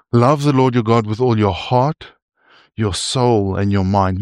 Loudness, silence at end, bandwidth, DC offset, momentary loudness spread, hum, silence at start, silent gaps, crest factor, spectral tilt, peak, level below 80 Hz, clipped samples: -16 LUFS; 0 s; 11.5 kHz; under 0.1%; 7 LU; none; 0.15 s; 2.22-2.28 s; 14 dB; -6.5 dB/octave; -2 dBFS; -46 dBFS; under 0.1%